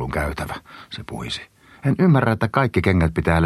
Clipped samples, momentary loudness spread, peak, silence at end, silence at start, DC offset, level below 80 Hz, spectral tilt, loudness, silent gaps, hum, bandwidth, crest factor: under 0.1%; 17 LU; 0 dBFS; 0 s; 0 s; under 0.1%; -36 dBFS; -7 dB/octave; -21 LUFS; none; none; 13 kHz; 20 dB